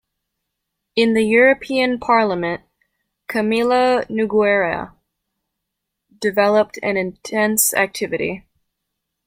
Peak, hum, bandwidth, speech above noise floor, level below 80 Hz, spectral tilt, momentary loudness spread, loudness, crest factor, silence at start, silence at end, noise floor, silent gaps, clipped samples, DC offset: -2 dBFS; none; 16.5 kHz; 62 dB; -56 dBFS; -3.5 dB/octave; 11 LU; -18 LUFS; 18 dB; 0.95 s; 0.9 s; -79 dBFS; none; under 0.1%; under 0.1%